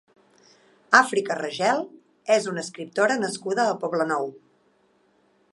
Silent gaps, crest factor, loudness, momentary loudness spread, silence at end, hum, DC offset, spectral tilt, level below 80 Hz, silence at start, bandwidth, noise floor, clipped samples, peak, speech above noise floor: none; 26 dB; -23 LUFS; 13 LU; 1.2 s; none; under 0.1%; -3.5 dB/octave; -78 dBFS; 0.9 s; 11.5 kHz; -64 dBFS; under 0.1%; 0 dBFS; 41 dB